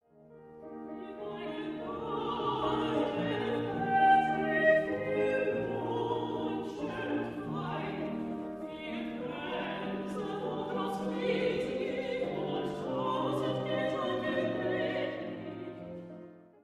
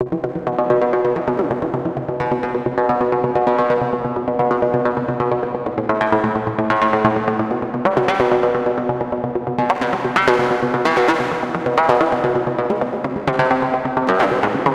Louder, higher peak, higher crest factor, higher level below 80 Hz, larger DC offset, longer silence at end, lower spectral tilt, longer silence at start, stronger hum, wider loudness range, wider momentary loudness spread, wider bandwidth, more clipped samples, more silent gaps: second, -33 LUFS vs -18 LUFS; second, -14 dBFS vs 0 dBFS; about the same, 18 dB vs 18 dB; second, -64 dBFS vs -48 dBFS; neither; first, 0.2 s vs 0 s; about the same, -6.5 dB/octave vs -7 dB/octave; first, 0.2 s vs 0 s; neither; first, 8 LU vs 2 LU; first, 14 LU vs 6 LU; first, 12.5 kHz vs 11 kHz; neither; neither